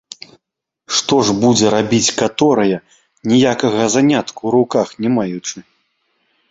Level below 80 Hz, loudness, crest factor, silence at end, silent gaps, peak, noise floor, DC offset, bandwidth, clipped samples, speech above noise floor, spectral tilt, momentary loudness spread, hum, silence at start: -54 dBFS; -15 LUFS; 16 dB; 0.9 s; none; 0 dBFS; -78 dBFS; under 0.1%; 8 kHz; under 0.1%; 63 dB; -4 dB/octave; 13 LU; none; 0.9 s